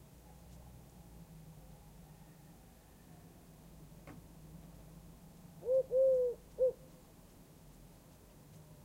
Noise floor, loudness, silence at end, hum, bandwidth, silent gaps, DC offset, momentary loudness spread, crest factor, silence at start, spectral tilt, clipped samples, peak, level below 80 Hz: -60 dBFS; -34 LUFS; 0.25 s; none; 16 kHz; none; under 0.1%; 26 LU; 18 dB; 0.5 s; -6.5 dB/octave; under 0.1%; -24 dBFS; -62 dBFS